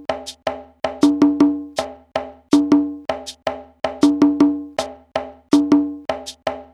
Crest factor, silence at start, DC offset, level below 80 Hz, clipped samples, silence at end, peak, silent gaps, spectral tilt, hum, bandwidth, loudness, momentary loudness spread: 18 dB; 0 s; under 0.1%; -52 dBFS; under 0.1%; 0.1 s; -2 dBFS; none; -5 dB/octave; none; 11 kHz; -20 LUFS; 13 LU